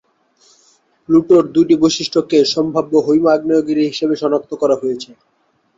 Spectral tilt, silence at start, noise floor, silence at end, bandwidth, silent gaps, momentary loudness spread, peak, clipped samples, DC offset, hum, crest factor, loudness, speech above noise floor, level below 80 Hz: -5.5 dB/octave; 1.1 s; -55 dBFS; 0.75 s; 7.8 kHz; none; 7 LU; -2 dBFS; under 0.1%; under 0.1%; none; 14 dB; -15 LUFS; 41 dB; -56 dBFS